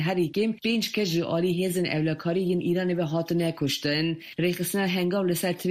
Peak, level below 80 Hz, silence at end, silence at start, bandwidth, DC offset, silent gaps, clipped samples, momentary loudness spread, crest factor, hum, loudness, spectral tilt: -12 dBFS; -64 dBFS; 0 s; 0 s; 15.5 kHz; under 0.1%; none; under 0.1%; 2 LU; 14 dB; none; -26 LUFS; -5.5 dB/octave